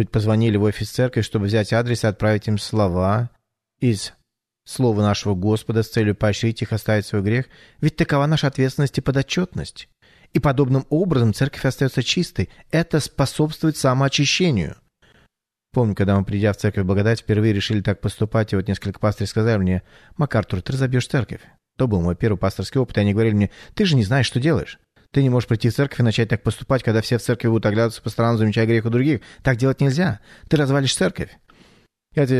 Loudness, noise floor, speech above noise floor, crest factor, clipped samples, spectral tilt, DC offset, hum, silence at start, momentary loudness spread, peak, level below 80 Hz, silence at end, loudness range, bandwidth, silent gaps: -20 LUFS; -66 dBFS; 47 dB; 16 dB; under 0.1%; -6 dB/octave; under 0.1%; none; 0 s; 6 LU; -4 dBFS; -44 dBFS; 0 s; 2 LU; 13.5 kHz; none